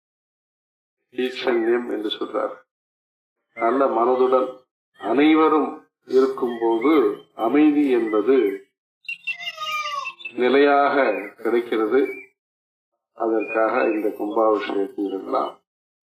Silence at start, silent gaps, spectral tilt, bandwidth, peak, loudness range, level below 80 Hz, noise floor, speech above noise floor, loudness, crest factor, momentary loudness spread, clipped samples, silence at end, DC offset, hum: 1.2 s; 2.71-3.36 s, 4.71-4.92 s, 8.78-9.01 s, 12.39-12.92 s; -5 dB/octave; 14 kHz; -8 dBFS; 4 LU; -74 dBFS; under -90 dBFS; over 70 dB; -21 LUFS; 14 dB; 12 LU; under 0.1%; 0.55 s; under 0.1%; none